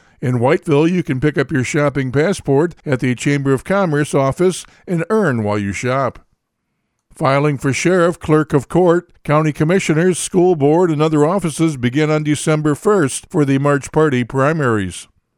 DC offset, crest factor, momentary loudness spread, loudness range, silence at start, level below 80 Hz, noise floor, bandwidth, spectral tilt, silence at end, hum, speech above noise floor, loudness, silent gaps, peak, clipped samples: under 0.1%; 14 dB; 5 LU; 3 LU; 0.2 s; -46 dBFS; -71 dBFS; 14 kHz; -6 dB/octave; 0.35 s; none; 56 dB; -16 LUFS; none; 0 dBFS; under 0.1%